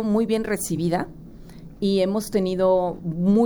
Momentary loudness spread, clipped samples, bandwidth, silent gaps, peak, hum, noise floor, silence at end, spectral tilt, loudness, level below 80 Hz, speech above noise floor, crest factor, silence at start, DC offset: 9 LU; under 0.1%; over 20 kHz; none; -8 dBFS; none; -41 dBFS; 0 s; -6 dB/octave; -23 LUFS; -46 dBFS; 20 dB; 14 dB; 0 s; under 0.1%